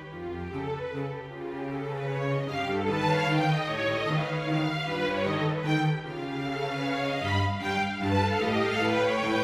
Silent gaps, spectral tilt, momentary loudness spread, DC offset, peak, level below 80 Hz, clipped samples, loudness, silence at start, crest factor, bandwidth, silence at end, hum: none; -6.5 dB/octave; 9 LU; under 0.1%; -12 dBFS; -58 dBFS; under 0.1%; -28 LUFS; 0 s; 16 dB; 12.5 kHz; 0 s; none